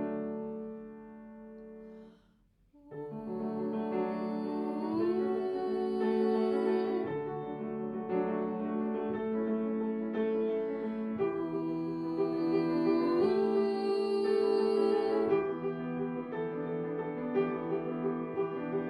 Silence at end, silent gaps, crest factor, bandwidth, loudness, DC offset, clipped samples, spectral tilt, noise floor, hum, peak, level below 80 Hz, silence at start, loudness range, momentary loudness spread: 0 s; none; 16 dB; 11.5 kHz; -33 LUFS; under 0.1%; under 0.1%; -8.5 dB/octave; -67 dBFS; none; -18 dBFS; -68 dBFS; 0 s; 9 LU; 12 LU